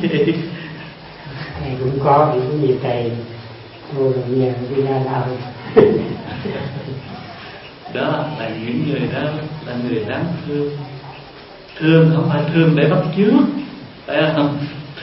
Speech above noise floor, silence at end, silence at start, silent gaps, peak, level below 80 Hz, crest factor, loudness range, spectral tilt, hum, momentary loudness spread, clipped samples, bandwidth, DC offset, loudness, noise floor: 21 dB; 0 s; 0 s; none; 0 dBFS; -48 dBFS; 18 dB; 7 LU; -12 dB/octave; none; 20 LU; under 0.1%; 5.8 kHz; under 0.1%; -18 LUFS; -38 dBFS